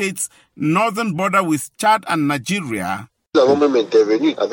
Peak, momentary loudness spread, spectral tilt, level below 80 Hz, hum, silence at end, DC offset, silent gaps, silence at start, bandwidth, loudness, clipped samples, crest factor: -4 dBFS; 10 LU; -5 dB/octave; -64 dBFS; none; 0 s; under 0.1%; none; 0 s; 17 kHz; -18 LUFS; under 0.1%; 14 dB